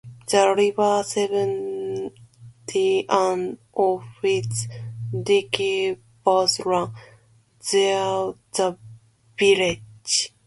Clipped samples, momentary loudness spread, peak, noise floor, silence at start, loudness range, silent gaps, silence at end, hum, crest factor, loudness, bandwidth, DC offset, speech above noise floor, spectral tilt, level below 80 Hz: under 0.1%; 12 LU; -2 dBFS; -56 dBFS; 0.05 s; 2 LU; none; 0.2 s; none; 22 dB; -22 LUFS; 11.5 kHz; under 0.1%; 35 dB; -3.5 dB/octave; -60 dBFS